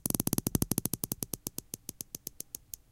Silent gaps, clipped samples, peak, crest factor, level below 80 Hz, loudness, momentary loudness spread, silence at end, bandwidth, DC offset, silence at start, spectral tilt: none; under 0.1%; -6 dBFS; 30 dB; -52 dBFS; -35 LUFS; 12 LU; 0.6 s; 17 kHz; under 0.1%; 0.05 s; -4 dB/octave